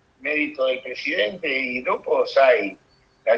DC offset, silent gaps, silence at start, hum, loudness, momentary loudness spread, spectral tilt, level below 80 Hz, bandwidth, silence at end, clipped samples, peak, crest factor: under 0.1%; none; 0.2 s; none; -22 LUFS; 9 LU; -4.5 dB/octave; -66 dBFS; 7.2 kHz; 0 s; under 0.1%; -4 dBFS; 18 dB